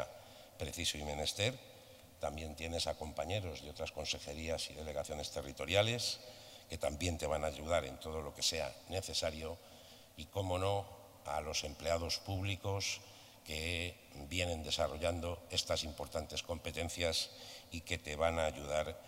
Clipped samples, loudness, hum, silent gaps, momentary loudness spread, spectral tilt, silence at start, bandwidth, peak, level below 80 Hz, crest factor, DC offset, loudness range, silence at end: under 0.1%; -39 LUFS; none; none; 14 LU; -3.5 dB/octave; 0 s; 16 kHz; -16 dBFS; -58 dBFS; 24 dB; under 0.1%; 3 LU; 0 s